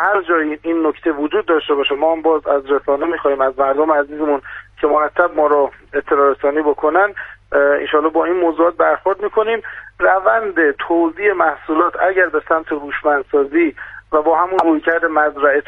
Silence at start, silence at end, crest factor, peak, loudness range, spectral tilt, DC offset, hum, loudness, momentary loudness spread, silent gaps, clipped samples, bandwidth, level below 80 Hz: 0 s; 0.05 s; 16 dB; 0 dBFS; 1 LU; -6.5 dB/octave; under 0.1%; none; -16 LUFS; 5 LU; none; under 0.1%; 4.3 kHz; -50 dBFS